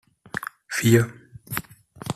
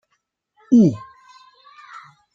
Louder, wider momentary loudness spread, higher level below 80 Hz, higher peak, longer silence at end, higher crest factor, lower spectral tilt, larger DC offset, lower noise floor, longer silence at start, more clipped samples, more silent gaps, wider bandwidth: second, -24 LUFS vs -16 LUFS; second, 15 LU vs 26 LU; first, -56 dBFS vs -64 dBFS; about the same, -4 dBFS vs -4 dBFS; second, 0 s vs 1.35 s; about the same, 22 dB vs 18 dB; second, -5.5 dB/octave vs -9 dB/octave; neither; second, -41 dBFS vs -72 dBFS; second, 0.35 s vs 0.7 s; neither; neither; first, 15 kHz vs 7.4 kHz